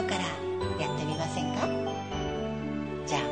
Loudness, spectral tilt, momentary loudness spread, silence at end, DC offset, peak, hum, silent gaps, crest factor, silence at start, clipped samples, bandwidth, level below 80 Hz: -32 LUFS; -5 dB/octave; 4 LU; 0 s; 0.2%; -16 dBFS; none; none; 16 dB; 0 s; under 0.1%; 9.6 kHz; -50 dBFS